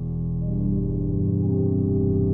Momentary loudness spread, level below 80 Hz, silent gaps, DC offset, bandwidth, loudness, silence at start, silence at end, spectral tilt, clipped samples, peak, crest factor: 4 LU; -34 dBFS; none; under 0.1%; 1.3 kHz; -24 LUFS; 0 s; 0 s; -15.5 dB/octave; under 0.1%; -12 dBFS; 10 dB